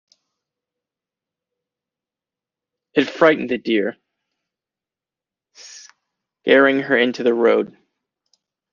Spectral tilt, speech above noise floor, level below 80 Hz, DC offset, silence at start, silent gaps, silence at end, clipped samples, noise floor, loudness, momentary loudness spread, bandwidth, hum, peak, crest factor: -5 dB/octave; 73 dB; -70 dBFS; under 0.1%; 2.95 s; none; 1.05 s; under 0.1%; -89 dBFS; -17 LUFS; 17 LU; 7.2 kHz; none; -2 dBFS; 20 dB